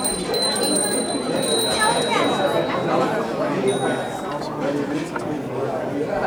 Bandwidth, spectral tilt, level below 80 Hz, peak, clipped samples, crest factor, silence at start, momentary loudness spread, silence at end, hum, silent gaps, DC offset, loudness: over 20 kHz; -3 dB/octave; -52 dBFS; -6 dBFS; under 0.1%; 16 dB; 0 s; 8 LU; 0 s; none; none; under 0.1%; -21 LUFS